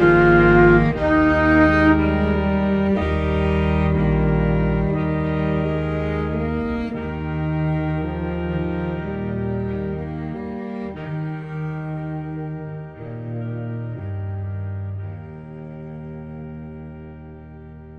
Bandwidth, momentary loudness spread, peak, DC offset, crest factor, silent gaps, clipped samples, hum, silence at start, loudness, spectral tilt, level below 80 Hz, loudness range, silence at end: 6.2 kHz; 20 LU; -2 dBFS; under 0.1%; 20 dB; none; under 0.1%; none; 0 s; -21 LUFS; -9.5 dB/octave; -32 dBFS; 13 LU; 0 s